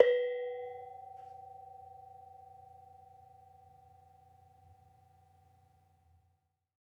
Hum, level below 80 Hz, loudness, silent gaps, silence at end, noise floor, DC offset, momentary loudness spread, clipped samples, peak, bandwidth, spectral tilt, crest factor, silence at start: none; -82 dBFS; -38 LUFS; none; 4.55 s; -77 dBFS; under 0.1%; 25 LU; under 0.1%; -8 dBFS; 4.8 kHz; -4.5 dB/octave; 32 dB; 0 s